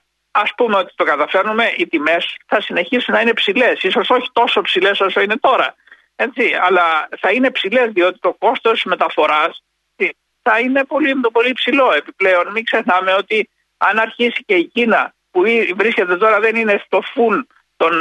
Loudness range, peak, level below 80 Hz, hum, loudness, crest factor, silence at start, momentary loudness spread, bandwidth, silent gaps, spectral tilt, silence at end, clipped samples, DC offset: 1 LU; -2 dBFS; -66 dBFS; none; -15 LUFS; 14 dB; 0.35 s; 5 LU; 11 kHz; none; -4.5 dB/octave; 0 s; under 0.1%; under 0.1%